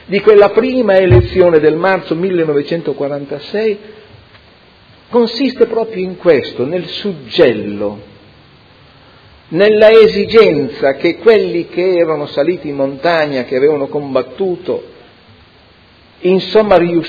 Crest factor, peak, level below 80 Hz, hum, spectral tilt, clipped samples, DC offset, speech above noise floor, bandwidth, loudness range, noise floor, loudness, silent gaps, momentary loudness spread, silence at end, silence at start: 12 dB; 0 dBFS; -36 dBFS; none; -8 dB/octave; 0.5%; under 0.1%; 33 dB; 5.4 kHz; 7 LU; -45 dBFS; -12 LUFS; none; 12 LU; 0 s; 0.1 s